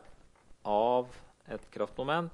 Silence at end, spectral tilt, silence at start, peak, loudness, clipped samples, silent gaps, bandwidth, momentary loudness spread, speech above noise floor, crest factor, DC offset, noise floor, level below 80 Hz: 0 s; -6.5 dB/octave; 0.1 s; -16 dBFS; -32 LUFS; under 0.1%; none; 11.5 kHz; 17 LU; 26 dB; 18 dB; under 0.1%; -58 dBFS; -60 dBFS